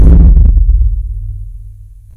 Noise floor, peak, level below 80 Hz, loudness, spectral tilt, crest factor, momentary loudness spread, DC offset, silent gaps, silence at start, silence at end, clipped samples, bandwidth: -32 dBFS; 0 dBFS; -8 dBFS; -10 LUFS; -11.5 dB/octave; 8 dB; 20 LU; under 0.1%; none; 0 s; 0.35 s; 0.2%; 1.6 kHz